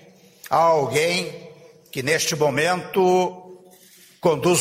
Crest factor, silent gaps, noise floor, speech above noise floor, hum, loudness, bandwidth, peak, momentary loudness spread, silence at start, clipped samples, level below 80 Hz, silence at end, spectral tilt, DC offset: 18 dB; none; -51 dBFS; 31 dB; none; -20 LUFS; 16 kHz; -4 dBFS; 10 LU; 0.45 s; under 0.1%; -62 dBFS; 0 s; -4 dB/octave; under 0.1%